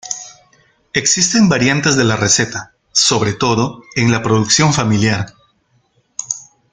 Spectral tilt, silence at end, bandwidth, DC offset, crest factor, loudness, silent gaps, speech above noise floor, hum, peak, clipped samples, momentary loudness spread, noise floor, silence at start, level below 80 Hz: -3.5 dB/octave; 0.3 s; 10 kHz; under 0.1%; 16 dB; -14 LUFS; none; 45 dB; none; 0 dBFS; under 0.1%; 14 LU; -59 dBFS; 0.05 s; -48 dBFS